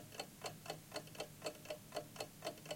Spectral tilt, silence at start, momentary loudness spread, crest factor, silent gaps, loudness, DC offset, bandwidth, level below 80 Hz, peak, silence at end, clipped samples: -3 dB/octave; 0 s; 3 LU; 22 dB; none; -49 LUFS; under 0.1%; 17 kHz; -74 dBFS; -28 dBFS; 0 s; under 0.1%